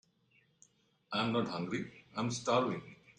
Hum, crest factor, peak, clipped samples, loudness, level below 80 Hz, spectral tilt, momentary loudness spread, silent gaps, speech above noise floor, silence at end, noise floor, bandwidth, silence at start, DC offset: none; 22 dB; -16 dBFS; under 0.1%; -36 LUFS; -74 dBFS; -5 dB/octave; 9 LU; none; 37 dB; 0.05 s; -72 dBFS; 10.5 kHz; 1.1 s; under 0.1%